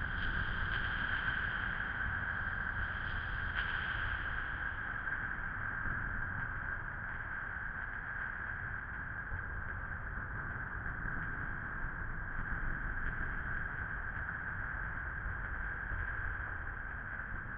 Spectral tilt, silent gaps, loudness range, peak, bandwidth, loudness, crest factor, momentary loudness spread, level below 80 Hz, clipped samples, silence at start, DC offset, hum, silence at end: -3 dB/octave; none; 4 LU; -22 dBFS; 5.2 kHz; -39 LUFS; 18 dB; 6 LU; -44 dBFS; under 0.1%; 0 s; under 0.1%; none; 0 s